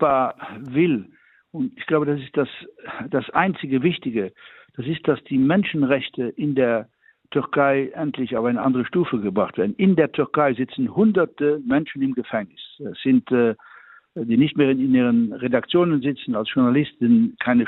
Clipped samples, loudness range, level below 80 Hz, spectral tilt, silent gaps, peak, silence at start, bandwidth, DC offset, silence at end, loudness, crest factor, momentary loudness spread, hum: under 0.1%; 4 LU; -62 dBFS; -10 dB/octave; none; -4 dBFS; 0 s; 4.1 kHz; under 0.1%; 0 s; -21 LUFS; 18 dB; 11 LU; none